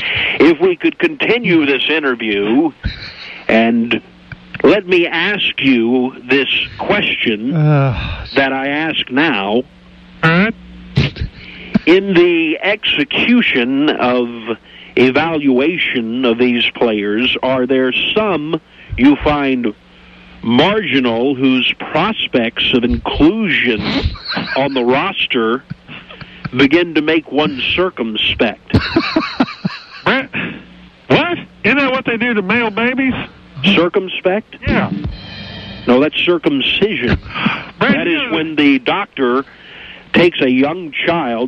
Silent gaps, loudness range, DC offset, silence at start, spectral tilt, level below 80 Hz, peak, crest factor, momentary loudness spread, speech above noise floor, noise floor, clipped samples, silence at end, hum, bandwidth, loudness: none; 3 LU; under 0.1%; 0 s; -7 dB/octave; -36 dBFS; -2 dBFS; 14 dB; 11 LU; 27 dB; -41 dBFS; under 0.1%; 0 s; none; 7 kHz; -14 LUFS